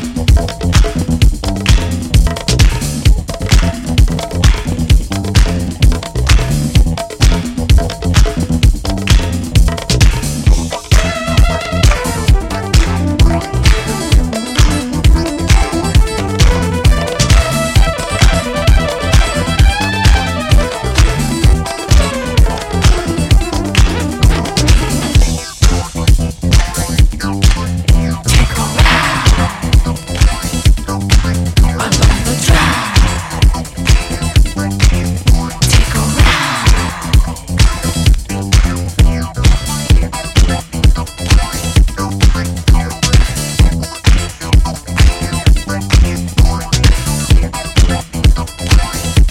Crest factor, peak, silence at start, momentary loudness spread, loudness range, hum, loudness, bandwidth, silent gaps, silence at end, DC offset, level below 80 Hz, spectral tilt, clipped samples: 10 dB; 0 dBFS; 0 s; 3 LU; 1 LU; none; -13 LUFS; 16 kHz; none; 0 s; 0.1%; -12 dBFS; -4.5 dB/octave; under 0.1%